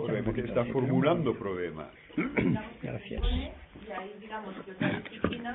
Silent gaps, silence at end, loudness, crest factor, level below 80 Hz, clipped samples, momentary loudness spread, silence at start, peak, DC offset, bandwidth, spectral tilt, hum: none; 0 s; -32 LUFS; 20 dB; -42 dBFS; under 0.1%; 14 LU; 0 s; -12 dBFS; under 0.1%; 4.1 kHz; -11 dB/octave; none